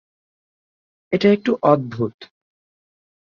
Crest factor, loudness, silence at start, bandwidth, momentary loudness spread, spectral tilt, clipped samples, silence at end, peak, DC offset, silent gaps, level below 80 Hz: 20 dB; -19 LUFS; 1.1 s; 7 kHz; 10 LU; -8 dB/octave; under 0.1%; 1 s; -2 dBFS; under 0.1%; 2.14-2.19 s; -62 dBFS